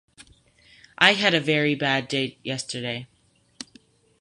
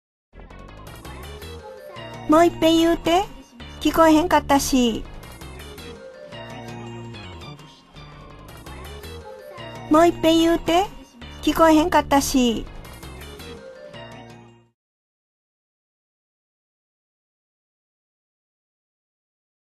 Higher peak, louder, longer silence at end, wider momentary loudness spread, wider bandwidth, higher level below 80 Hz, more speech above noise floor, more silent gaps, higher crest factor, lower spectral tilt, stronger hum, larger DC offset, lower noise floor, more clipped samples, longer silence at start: about the same, -2 dBFS vs -4 dBFS; second, -22 LUFS vs -18 LUFS; second, 0.6 s vs 5.5 s; about the same, 24 LU vs 24 LU; second, 11.5 kHz vs 14 kHz; second, -66 dBFS vs -42 dBFS; first, 33 dB vs 29 dB; neither; about the same, 24 dB vs 20 dB; about the same, -4 dB/octave vs -4.5 dB/octave; neither; neither; first, -56 dBFS vs -46 dBFS; neither; second, 0.2 s vs 0.35 s